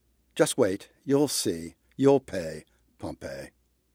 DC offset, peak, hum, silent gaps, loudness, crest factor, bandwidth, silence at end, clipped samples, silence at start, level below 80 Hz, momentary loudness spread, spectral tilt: under 0.1%; -8 dBFS; none; none; -26 LUFS; 20 dB; 16.5 kHz; 0.45 s; under 0.1%; 0.35 s; -60 dBFS; 19 LU; -4.5 dB/octave